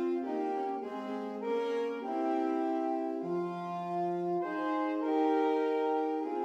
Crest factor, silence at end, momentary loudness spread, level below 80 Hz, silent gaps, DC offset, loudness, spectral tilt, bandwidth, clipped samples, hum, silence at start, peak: 14 dB; 0 s; 8 LU; -88 dBFS; none; under 0.1%; -33 LUFS; -7.5 dB/octave; 8 kHz; under 0.1%; none; 0 s; -18 dBFS